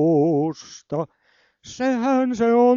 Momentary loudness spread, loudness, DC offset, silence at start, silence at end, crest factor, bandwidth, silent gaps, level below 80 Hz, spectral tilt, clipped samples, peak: 16 LU; -21 LUFS; under 0.1%; 0 s; 0 s; 12 dB; 7.4 kHz; none; -62 dBFS; -7 dB/octave; under 0.1%; -8 dBFS